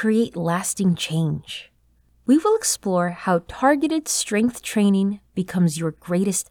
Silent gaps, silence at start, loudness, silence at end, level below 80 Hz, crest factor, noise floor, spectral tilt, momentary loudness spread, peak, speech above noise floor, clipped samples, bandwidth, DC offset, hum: none; 0 s; -21 LUFS; 0.05 s; -56 dBFS; 14 dB; -60 dBFS; -5 dB/octave; 8 LU; -6 dBFS; 39 dB; under 0.1%; 19.5 kHz; under 0.1%; none